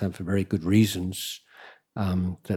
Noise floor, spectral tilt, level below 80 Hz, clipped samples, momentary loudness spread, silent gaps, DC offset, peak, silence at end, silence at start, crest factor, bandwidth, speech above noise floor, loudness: -51 dBFS; -6 dB/octave; -54 dBFS; under 0.1%; 13 LU; none; under 0.1%; -8 dBFS; 0 s; 0 s; 18 dB; 17.5 kHz; 26 dB; -26 LUFS